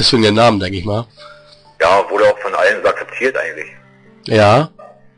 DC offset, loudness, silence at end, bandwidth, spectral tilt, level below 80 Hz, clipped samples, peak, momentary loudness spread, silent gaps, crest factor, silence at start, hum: under 0.1%; -14 LUFS; 0.3 s; 10.5 kHz; -5 dB/octave; -46 dBFS; under 0.1%; -2 dBFS; 14 LU; none; 12 dB; 0 s; none